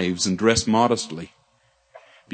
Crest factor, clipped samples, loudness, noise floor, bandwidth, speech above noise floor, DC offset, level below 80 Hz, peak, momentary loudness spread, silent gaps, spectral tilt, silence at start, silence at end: 20 dB; under 0.1%; -21 LUFS; -63 dBFS; 9.4 kHz; 42 dB; under 0.1%; -52 dBFS; -2 dBFS; 17 LU; none; -4 dB/octave; 0 s; 0.35 s